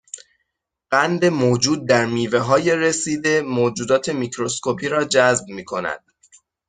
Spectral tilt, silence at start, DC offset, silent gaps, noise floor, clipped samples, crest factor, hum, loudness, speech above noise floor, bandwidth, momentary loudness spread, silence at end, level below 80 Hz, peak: -4 dB/octave; 0.15 s; under 0.1%; none; -76 dBFS; under 0.1%; 18 dB; none; -19 LUFS; 57 dB; 9.6 kHz; 10 LU; 0.7 s; -60 dBFS; -2 dBFS